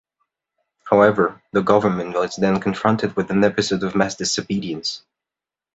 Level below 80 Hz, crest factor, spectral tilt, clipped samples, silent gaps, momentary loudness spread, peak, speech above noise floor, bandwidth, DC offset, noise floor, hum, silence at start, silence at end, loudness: -54 dBFS; 18 dB; -5 dB/octave; under 0.1%; none; 9 LU; -2 dBFS; 70 dB; 8.2 kHz; under 0.1%; -89 dBFS; none; 0.85 s; 0.75 s; -20 LUFS